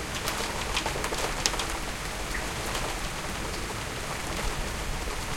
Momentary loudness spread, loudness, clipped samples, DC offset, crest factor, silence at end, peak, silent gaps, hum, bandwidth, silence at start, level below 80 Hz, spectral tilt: 6 LU; -31 LUFS; under 0.1%; under 0.1%; 30 dB; 0 s; -2 dBFS; none; none; 17 kHz; 0 s; -38 dBFS; -2.5 dB/octave